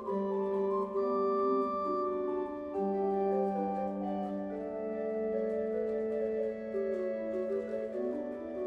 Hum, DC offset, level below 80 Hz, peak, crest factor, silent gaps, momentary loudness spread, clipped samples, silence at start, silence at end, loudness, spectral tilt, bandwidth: none; under 0.1%; -66 dBFS; -20 dBFS; 14 dB; none; 6 LU; under 0.1%; 0 s; 0 s; -34 LUFS; -9.5 dB/octave; 5 kHz